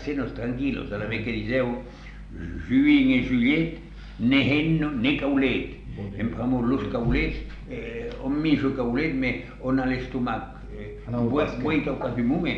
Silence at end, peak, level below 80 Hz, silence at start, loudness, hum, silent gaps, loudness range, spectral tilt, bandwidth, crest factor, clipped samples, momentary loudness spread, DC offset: 0 s; -8 dBFS; -40 dBFS; 0 s; -25 LUFS; none; none; 4 LU; -8 dB/octave; 6.6 kHz; 16 dB; under 0.1%; 15 LU; under 0.1%